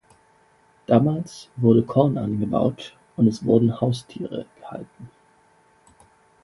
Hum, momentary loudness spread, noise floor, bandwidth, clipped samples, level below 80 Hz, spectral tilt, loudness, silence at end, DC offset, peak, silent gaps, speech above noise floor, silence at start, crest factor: none; 19 LU; -58 dBFS; 11.5 kHz; under 0.1%; -56 dBFS; -8.5 dB/octave; -21 LUFS; 1.35 s; under 0.1%; -2 dBFS; none; 37 dB; 0.9 s; 20 dB